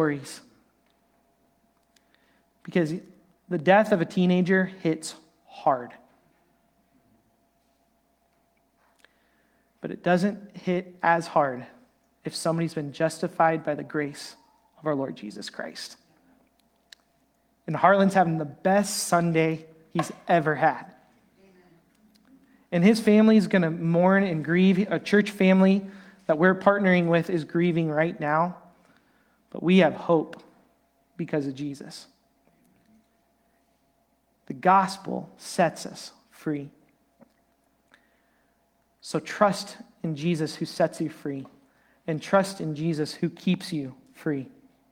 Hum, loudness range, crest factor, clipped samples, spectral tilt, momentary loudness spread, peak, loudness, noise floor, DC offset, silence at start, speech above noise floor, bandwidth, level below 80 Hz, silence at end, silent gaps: none; 13 LU; 22 dB; under 0.1%; -6 dB/octave; 18 LU; -4 dBFS; -25 LUFS; -68 dBFS; under 0.1%; 0 s; 44 dB; 15.5 kHz; -70 dBFS; 0.45 s; none